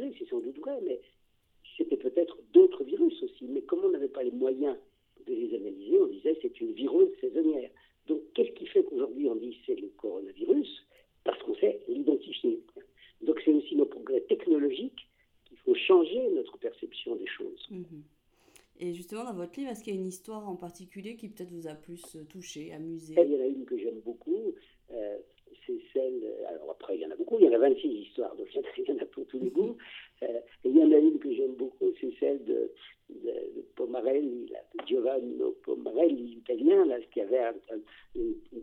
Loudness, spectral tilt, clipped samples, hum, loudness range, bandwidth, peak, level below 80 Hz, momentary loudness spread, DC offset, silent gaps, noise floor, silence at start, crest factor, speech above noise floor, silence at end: -30 LUFS; -6 dB/octave; under 0.1%; none; 12 LU; 11 kHz; -8 dBFS; -70 dBFS; 19 LU; under 0.1%; none; -62 dBFS; 0 s; 22 dB; 33 dB; 0 s